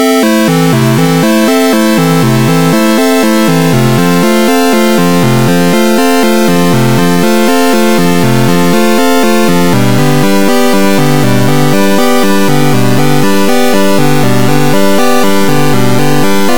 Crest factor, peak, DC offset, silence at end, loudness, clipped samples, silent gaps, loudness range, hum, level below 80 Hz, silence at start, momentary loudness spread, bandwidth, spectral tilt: 8 dB; 0 dBFS; 20%; 0 s; -8 LUFS; under 0.1%; none; 1 LU; none; -40 dBFS; 0 s; 1 LU; 19.5 kHz; -5.5 dB/octave